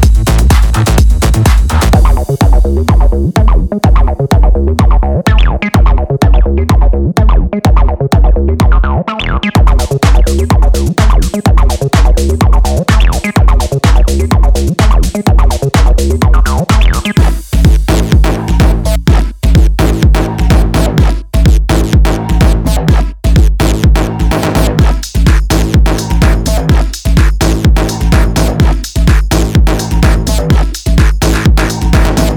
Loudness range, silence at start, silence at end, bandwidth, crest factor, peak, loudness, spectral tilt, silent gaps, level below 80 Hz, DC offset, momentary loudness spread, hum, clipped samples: 1 LU; 0 s; 0 s; 16.5 kHz; 8 dB; 0 dBFS; -10 LUFS; -6 dB/octave; none; -8 dBFS; under 0.1%; 3 LU; none; under 0.1%